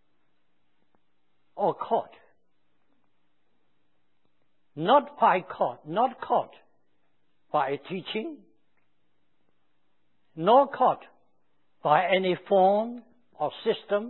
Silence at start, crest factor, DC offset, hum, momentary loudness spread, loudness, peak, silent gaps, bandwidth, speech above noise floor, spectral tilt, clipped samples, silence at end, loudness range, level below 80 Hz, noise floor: 1.55 s; 22 dB; under 0.1%; 60 Hz at -70 dBFS; 13 LU; -26 LUFS; -6 dBFS; none; 4.2 kHz; 52 dB; -9.5 dB/octave; under 0.1%; 0 s; 11 LU; -82 dBFS; -77 dBFS